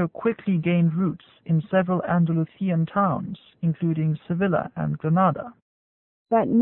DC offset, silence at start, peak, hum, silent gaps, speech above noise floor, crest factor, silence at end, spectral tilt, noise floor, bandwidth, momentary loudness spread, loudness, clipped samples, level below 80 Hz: under 0.1%; 0 s; -10 dBFS; none; 5.62-6.25 s; over 67 dB; 14 dB; 0 s; -13 dB/octave; under -90 dBFS; 3.9 kHz; 8 LU; -24 LUFS; under 0.1%; -60 dBFS